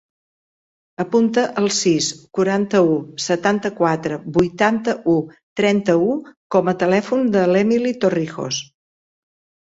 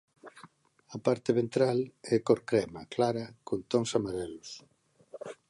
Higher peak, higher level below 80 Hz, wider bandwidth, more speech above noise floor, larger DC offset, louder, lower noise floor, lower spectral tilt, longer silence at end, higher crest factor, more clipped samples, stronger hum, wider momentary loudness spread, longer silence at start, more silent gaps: first, -2 dBFS vs -10 dBFS; first, -56 dBFS vs -66 dBFS; second, 8 kHz vs 11.5 kHz; first, over 72 dB vs 28 dB; neither; first, -19 LUFS vs -31 LUFS; first, under -90 dBFS vs -58 dBFS; about the same, -5 dB/octave vs -6 dB/octave; first, 1 s vs 0.15 s; second, 16 dB vs 22 dB; neither; neither; second, 7 LU vs 19 LU; first, 1 s vs 0.25 s; first, 5.43-5.56 s, 6.37-6.50 s vs none